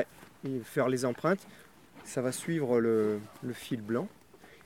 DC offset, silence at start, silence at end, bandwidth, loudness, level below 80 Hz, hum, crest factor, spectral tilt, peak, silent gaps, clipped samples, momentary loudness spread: under 0.1%; 0 s; 0.1 s; 17 kHz; -32 LUFS; -72 dBFS; none; 18 dB; -6 dB/octave; -14 dBFS; none; under 0.1%; 13 LU